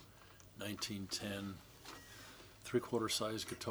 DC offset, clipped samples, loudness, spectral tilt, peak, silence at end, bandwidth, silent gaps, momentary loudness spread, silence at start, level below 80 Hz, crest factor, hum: under 0.1%; under 0.1%; -41 LUFS; -3.5 dB/octave; -22 dBFS; 0 s; over 20 kHz; none; 18 LU; 0 s; -70 dBFS; 22 dB; none